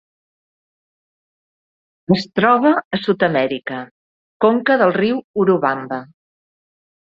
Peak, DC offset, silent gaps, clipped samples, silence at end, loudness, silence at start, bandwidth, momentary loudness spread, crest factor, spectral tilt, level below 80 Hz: -2 dBFS; under 0.1%; 2.85-2.91 s, 3.91-4.40 s, 5.24-5.34 s; under 0.1%; 1.1 s; -17 LUFS; 2.1 s; 7.4 kHz; 14 LU; 18 dB; -7.5 dB/octave; -60 dBFS